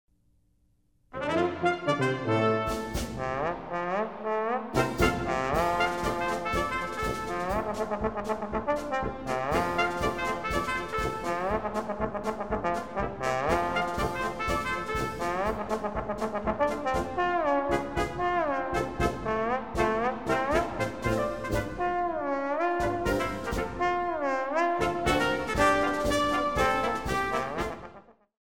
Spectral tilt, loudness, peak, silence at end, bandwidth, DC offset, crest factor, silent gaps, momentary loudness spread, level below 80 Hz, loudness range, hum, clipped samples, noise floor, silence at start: -5 dB/octave; -29 LUFS; -10 dBFS; 0.05 s; 17.5 kHz; 0.3%; 18 dB; none; 6 LU; -44 dBFS; 3 LU; none; under 0.1%; -68 dBFS; 0.05 s